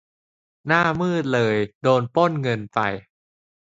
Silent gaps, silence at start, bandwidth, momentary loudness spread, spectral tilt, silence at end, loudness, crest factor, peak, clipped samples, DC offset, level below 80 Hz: 1.75-1.81 s; 0.65 s; 7.8 kHz; 7 LU; -6.5 dB/octave; 0.65 s; -21 LUFS; 20 dB; -2 dBFS; under 0.1%; under 0.1%; -58 dBFS